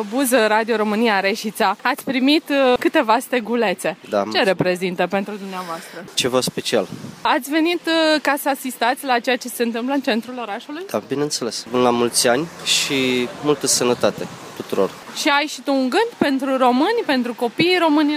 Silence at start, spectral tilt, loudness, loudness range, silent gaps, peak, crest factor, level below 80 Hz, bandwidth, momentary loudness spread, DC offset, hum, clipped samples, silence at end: 0 s; -3 dB/octave; -19 LUFS; 3 LU; none; -4 dBFS; 16 dB; -64 dBFS; 15.5 kHz; 9 LU; under 0.1%; none; under 0.1%; 0 s